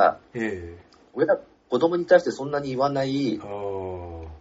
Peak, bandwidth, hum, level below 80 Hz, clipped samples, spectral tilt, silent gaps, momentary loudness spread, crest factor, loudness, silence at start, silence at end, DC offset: -6 dBFS; 7.8 kHz; none; -52 dBFS; under 0.1%; -5 dB/octave; none; 17 LU; 18 dB; -25 LUFS; 0 s; 0 s; under 0.1%